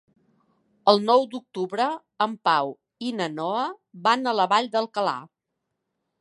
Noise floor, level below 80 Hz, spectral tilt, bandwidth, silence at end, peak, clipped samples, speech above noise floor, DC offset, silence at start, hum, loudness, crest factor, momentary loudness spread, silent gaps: -81 dBFS; -80 dBFS; -4.5 dB/octave; 11.5 kHz; 0.95 s; -2 dBFS; under 0.1%; 57 dB; under 0.1%; 0.85 s; none; -24 LUFS; 24 dB; 11 LU; none